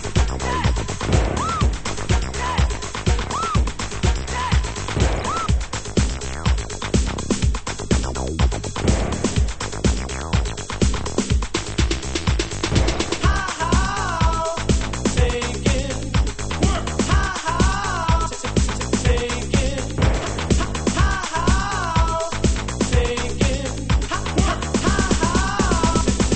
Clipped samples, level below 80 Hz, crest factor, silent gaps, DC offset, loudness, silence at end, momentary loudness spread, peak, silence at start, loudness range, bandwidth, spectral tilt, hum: under 0.1%; -24 dBFS; 16 dB; none; under 0.1%; -21 LUFS; 0 s; 4 LU; -4 dBFS; 0 s; 2 LU; 8.8 kHz; -4.5 dB/octave; none